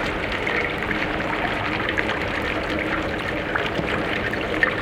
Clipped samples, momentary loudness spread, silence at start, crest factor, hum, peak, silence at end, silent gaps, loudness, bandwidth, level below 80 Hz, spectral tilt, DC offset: under 0.1%; 2 LU; 0 s; 22 dB; none; -2 dBFS; 0 s; none; -23 LUFS; 16.5 kHz; -40 dBFS; -5.5 dB/octave; under 0.1%